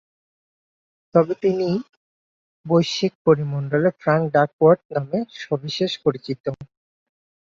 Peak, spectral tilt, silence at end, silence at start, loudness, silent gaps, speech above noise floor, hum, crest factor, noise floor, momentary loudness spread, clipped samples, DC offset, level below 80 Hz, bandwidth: -2 dBFS; -6.5 dB/octave; 0.95 s; 1.15 s; -21 LUFS; 1.89-2.64 s, 3.15-3.25 s, 4.53-4.59 s, 4.85-4.89 s, 6.40-6.44 s; over 70 dB; none; 20 dB; under -90 dBFS; 10 LU; under 0.1%; under 0.1%; -64 dBFS; 7.6 kHz